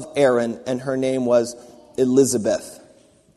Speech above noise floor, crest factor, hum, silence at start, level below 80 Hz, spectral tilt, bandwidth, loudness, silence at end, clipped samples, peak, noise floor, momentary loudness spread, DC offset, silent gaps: 34 dB; 16 dB; none; 0 s; -60 dBFS; -5 dB/octave; 12.5 kHz; -20 LUFS; 0.6 s; under 0.1%; -4 dBFS; -53 dBFS; 14 LU; under 0.1%; none